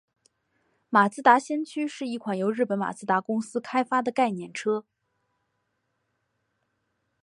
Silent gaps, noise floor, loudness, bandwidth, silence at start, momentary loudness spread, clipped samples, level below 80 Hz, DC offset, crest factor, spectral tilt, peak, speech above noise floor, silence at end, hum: none; -77 dBFS; -26 LUFS; 11.5 kHz; 0.9 s; 11 LU; under 0.1%; -80 dBFS; under 0.1%; 24 dB; -5.5 dB/octave; -4 dBFS; 52 dB; 2.4 s; none